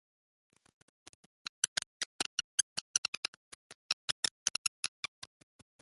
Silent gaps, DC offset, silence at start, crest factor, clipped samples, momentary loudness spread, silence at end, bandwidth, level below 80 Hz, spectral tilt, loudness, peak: 1.68-1.76 s, 1.86-2.00 s, 2.06-2.19 s, 2.26-2.38 s, 2.44-4.23 s, 4.31-4.46 s, 4.58-4.83 s; under 0.1%; 1.65 s; 30 dB; under 0.1%; 20 LU; 0.95 s; 12 kHz; -78 dBFS; 2 dB/octave; -35 LUFS; -10 dBFS